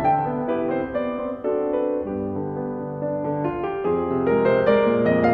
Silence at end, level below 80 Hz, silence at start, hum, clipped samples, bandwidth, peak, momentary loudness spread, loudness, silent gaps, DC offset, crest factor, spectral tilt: 0 s; -50 dBFS; 0 s; none; under 0.1%; 5.4 kHz; -6 dBFS; 9 LU; -23 LUFS; none; under 0.1%; 16 dB; -10 dB/octave